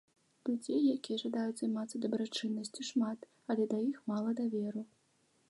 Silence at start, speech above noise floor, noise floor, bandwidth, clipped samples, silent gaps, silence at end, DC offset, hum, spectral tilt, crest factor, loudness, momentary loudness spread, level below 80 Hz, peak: 0.45 s; 38 dB; -73 dBFS; 11.5 kHz; under 0.1%; none; 0.65 s; under 0.1%; none; -5 dB/octave; 14 dB; -36 LUFS; 8 LU; -86 dBFS; -22 dBFS